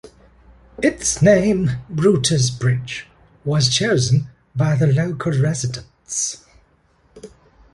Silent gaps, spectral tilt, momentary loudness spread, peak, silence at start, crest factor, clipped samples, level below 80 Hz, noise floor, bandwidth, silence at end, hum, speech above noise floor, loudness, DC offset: none; -5 dB/octave; 13 LU; -2 dBFS; 0.05 s; 18 dB; under 0.1%; -46 dBFS; -58 dBFS; 11.5 kHz; 0.45 s; none; 40 dB; -18 LUFS; under 0.1%